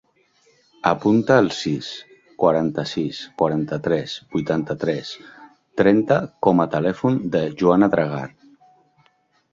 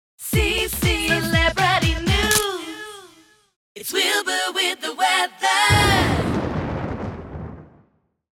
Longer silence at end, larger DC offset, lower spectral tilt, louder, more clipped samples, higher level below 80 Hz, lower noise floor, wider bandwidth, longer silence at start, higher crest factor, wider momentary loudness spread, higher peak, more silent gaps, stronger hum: first, 1.25 s vs 0.75 s; neither; first, -7 dB/octave vs -3.5 dB/octave; about the same, -20 LUFS vs -19 LUFS; neither; second, -56 dBFS vs -34 dBFS; about the same, -63 dBFS vs -62 dBFS; second, 7.8 kHz vs 19 kHz; first, 0.85 s vs 0.2 s; about the same, 20 dB vs 20 dB; second, 12 LU vs 16 LU; about the same, -2 dBFS vs -2 dBFS; second, none vs 3.56-3.75 s; neither